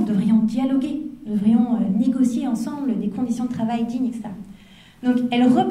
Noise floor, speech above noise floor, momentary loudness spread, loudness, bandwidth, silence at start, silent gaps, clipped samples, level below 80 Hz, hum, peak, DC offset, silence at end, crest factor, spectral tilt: -47 dBFS; 26 dB; 9 LU; -21 LUFS; 11.5 kHz; 0 s; none; under 0.1%; -56 dBFS; none; -4 dBFS; under 0.1%; 0 s; 16 dB; -7 dB/octave